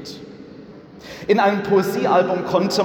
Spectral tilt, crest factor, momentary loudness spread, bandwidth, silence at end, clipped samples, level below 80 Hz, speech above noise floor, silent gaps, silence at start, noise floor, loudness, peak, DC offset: -5.5 dB/octave; 16 dB; 22 LU; 19 kHz; 0 s; under 0.1%; -58 dBFS; 22 dB; none; 0 s; -40 dBFS; -18 LUFS; -4 dBFS; under 0.1%